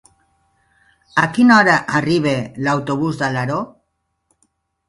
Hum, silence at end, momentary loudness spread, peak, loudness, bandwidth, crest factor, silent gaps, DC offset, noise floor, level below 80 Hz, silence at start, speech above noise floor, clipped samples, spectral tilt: none; 1.2 s; 11 LU; 0 dBFS; -16 LUFS; 11.5 kHz; 18 dB; none; under 0.1%; -71 dBFS; -54 dBFS; 1.15 s; 55 dB; under 0.1%; -6 dB/octave